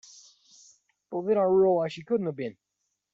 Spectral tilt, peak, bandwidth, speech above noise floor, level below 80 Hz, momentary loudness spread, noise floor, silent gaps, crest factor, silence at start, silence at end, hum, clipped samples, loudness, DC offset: -7 dB/octave; -14 dBFS; 7.6 kHz; 35 dB; -72 dBFS; 15 LU; -61 dBFS; none; 14 dB; 1.1 s; 0.6 s; none; under 0.1%; -27 LUFS; under 0.1%